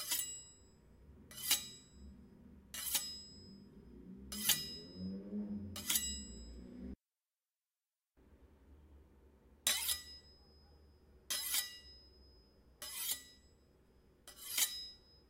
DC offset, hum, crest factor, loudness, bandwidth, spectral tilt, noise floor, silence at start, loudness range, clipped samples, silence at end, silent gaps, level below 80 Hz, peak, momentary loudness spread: under 0.1%; none; 30 dB; -38 LUFS; 16 kHz; -1 dB/octave; under -90 dBFS; 0 s; 4 LU; under 0.1%; 0.1 s; none; -64 dBFS; -14 dBFS; 24 LU